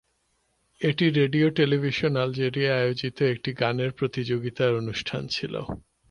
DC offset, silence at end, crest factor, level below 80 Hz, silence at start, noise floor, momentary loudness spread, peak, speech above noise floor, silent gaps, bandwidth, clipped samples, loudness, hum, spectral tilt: under 0.1%; 0.3 s; 16 dB; -56 dBFS; 0.8 s; -71 dBFS; 8 LU; -8 dBFS; 46 dB; none; 10.5 kHz; under 0.1%; -25 LUFS; none; -7 dB/octave